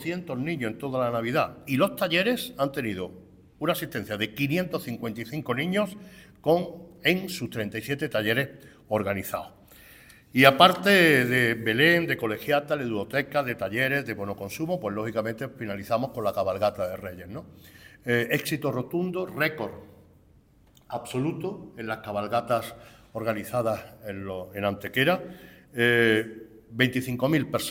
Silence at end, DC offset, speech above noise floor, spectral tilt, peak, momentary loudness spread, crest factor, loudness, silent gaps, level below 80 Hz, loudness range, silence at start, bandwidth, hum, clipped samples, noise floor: 0 s; under 0.1%; 32 dB; -5 dB/octave; -2 dBFS; 16 LU; 26 dB; -26 LUFS; none; -60 dBFS; 10 LU; 0 s; 17 kHz; none; under 0.1%; -58 dBFS